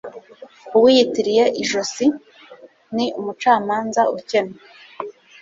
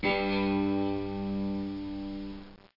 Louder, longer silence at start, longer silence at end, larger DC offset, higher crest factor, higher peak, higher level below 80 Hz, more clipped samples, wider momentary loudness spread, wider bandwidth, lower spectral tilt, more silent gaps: first, -18 LUFS vs -32 LUFS; about the same, 0.05 s vs 0 s; about the same, 0.3 s vs 0.2 s; neither; about the same, 18 dB vs 14 dB; first, -2 dBFS vs -16 dBFS; second, -64 dBFS vs -50 dBFS; neither; first, 20 LU vs 12 LU; first, 8 kHz vs 5.8 kHz; second, -3.5 dB/octave vs -8.5 dB/octave; neither